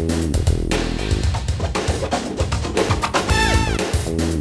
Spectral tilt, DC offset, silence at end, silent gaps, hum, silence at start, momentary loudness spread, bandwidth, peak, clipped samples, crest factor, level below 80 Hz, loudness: -5 dB/octave; under 0.1%; 0 s; none; none; 0 s; 5 LU; 11 kHz; -4 dBFS; under 0.1%; 16 dB; -26 dBFS; -20 LUFS